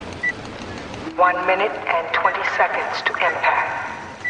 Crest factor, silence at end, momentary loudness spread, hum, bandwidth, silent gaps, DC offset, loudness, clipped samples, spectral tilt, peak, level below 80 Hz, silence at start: 18 dB; 0 s; 13 LU; none; 10 kHz; none; under 0.1%; -20 LUFS; under 0.1%; -4 dB/octave; -4 dBFS; -54 dBFS; 0 s